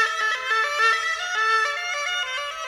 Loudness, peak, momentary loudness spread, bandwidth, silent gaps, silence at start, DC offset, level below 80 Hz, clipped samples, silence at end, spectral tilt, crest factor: -22 LUFS; -8 dBFS; 6 LU; 15 kHz; none; 0 s; under 0.1%; -66 dBFS; under 0.1%; 0 s; 3 dB/octave; 14 dB